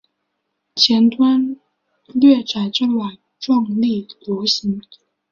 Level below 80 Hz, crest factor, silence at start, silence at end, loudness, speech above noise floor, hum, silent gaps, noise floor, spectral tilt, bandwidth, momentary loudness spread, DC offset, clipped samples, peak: -62 dBFS; 18 dB; 0.75 s; 0.5 s; -17 LUFS; 57 dB; none; none; -74 dBFS; -5 dB/octave; 7.2 kHz; 16 LU; under 0.1%; under 0.1%; 0 dBFS